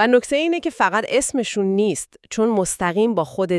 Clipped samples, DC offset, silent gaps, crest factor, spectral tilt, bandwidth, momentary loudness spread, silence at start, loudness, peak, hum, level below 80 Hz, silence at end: under 0.1%; under 0.1%; none; 16 dB; -4 dB/octave; 12 kHz; 5 LU; 0 s; -20 LUFS; -2 dBFS; none; -54 dBFS; 0 s